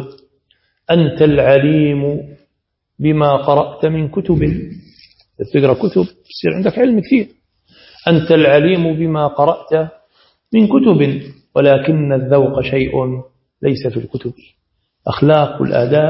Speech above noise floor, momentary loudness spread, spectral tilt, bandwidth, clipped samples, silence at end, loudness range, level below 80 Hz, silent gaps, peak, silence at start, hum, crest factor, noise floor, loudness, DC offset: 59 dB; 14 LU; -11 dB/octave; 5.8 kHz; under 0.1%; 0 s; 3 LU; -42 dBFS; none; 0 dBFS; 0 s; none; 14 dB; -72 dBFS; -14 LUFS; under 0.1%